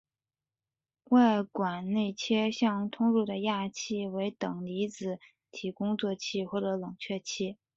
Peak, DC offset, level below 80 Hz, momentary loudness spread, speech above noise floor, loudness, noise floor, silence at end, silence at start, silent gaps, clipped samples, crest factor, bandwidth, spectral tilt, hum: -12 dBFS; under 0.1%; -74 dBFS; 10 LU; over 60 dB; -31 LUFS; under -90 dBFS; 0.2 s; 1.1 s; none; under 0.1%; 18 dB; 7.8 kHz; -5.5 dB/octave; none